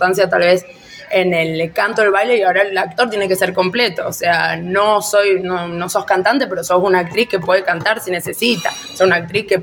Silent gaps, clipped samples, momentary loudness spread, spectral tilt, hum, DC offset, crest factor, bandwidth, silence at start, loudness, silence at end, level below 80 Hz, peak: none; under 0.1%; 6 LU; -4 dB/octave; none; under 0.1%; 14 dB; 17.5 kHz; 0 s; -15 LUFS; 0 s; -54 dBFS; 0 dBFS